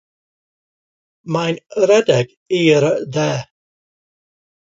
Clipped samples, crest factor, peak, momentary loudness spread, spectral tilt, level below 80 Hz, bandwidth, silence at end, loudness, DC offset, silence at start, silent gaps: under 0.1%; 18 dB; -2 dBFS; 8 LU; -5.5 dB/octave; -62 dBFS; 7.8 kHz; 1.25 s; -17 LUFS; under 0.1%; 1.25 s; 2.37-2.46 s